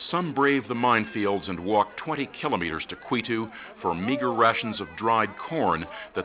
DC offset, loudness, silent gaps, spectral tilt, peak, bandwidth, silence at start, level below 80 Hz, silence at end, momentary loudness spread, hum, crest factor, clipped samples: under 0.1%; -26 LUFS; none; -9.5 dB/octave; -8 dBFS; 4 kHz; 0 s; -56 dBFS; 0 s; 8 LU; none; 20 dB; under 0.1%